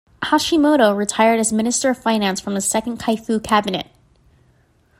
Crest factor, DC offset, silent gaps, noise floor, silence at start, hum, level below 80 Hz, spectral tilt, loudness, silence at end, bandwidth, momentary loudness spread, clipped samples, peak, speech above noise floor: 18 dB; under 0.1%; none; -57 dBFS; 0.2 s; none; -52 dBFS; -3.5 dB/octave; -18 LUFS; 1.15 s; 16 kHz; 7 LU; under 0.1%; -2 dBFS; 39 dB